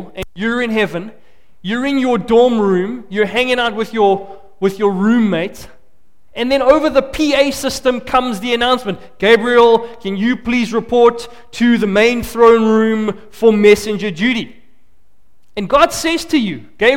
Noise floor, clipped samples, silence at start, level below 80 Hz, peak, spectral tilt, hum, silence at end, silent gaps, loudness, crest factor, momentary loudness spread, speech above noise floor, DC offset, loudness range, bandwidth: -58 dBFS; under 0.1%; 0 s; -42 dBFS; 0 dBFS; -5 dB/octave; none; 0 s; none; -14 LUFS; 14 dB; 12 LU; 44 dB; 1%; 4 LU; 17 kHz